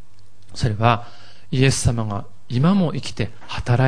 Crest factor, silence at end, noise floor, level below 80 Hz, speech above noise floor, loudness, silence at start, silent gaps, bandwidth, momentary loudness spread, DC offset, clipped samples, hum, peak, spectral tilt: 20 dB; 0 s; -53 dBFS; -40 dBFS; 33 dB; -21 LUFS; 0.5 s; none; 10.5 kHz; 11 LU; 3%; under 0.1%; none; 0 dBFS; -5.5 dB/octave